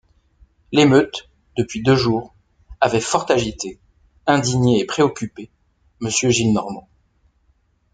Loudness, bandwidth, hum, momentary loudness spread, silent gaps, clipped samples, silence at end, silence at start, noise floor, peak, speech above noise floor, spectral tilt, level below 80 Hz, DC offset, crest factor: -18 LUFS; 9.6 kHz; none; 15 LU; none; under 0.1%; 1.15 s; 0.7 s; -62 dBFS; -2 dBFS; 44 dB; -5 dB/octave; -48 dBFS; under 0.1%; 18 dB